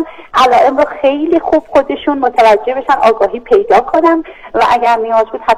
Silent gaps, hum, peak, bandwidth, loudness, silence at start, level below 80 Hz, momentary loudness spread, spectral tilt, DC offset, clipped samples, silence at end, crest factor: none; none; 0 dBFS; 13.5 kHz; -11 LUFS; 0 s; -42 dBFS; 5 LU; -4.5 dB/octave; 0.2%; under 0.1%; 0 s; 10 dB